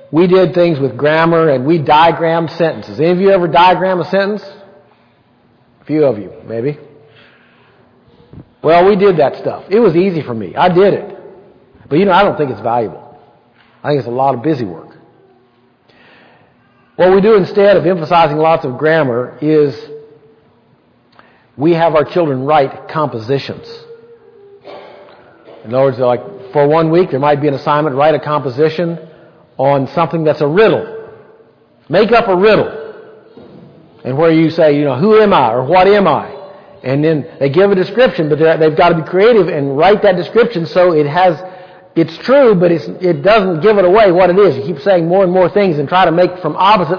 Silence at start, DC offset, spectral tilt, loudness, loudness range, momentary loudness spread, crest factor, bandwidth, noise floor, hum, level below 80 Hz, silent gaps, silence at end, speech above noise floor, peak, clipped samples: 0.1 s; under 0.1%; -8.5 dB/octave; -11 LUFS; 9 LU; 11 LU; 12 dB; 5.4 kHz; -51 dBFS; none; -48 dBFS; none; 0 s; 41 dB; 0 dBFS; under 0.1%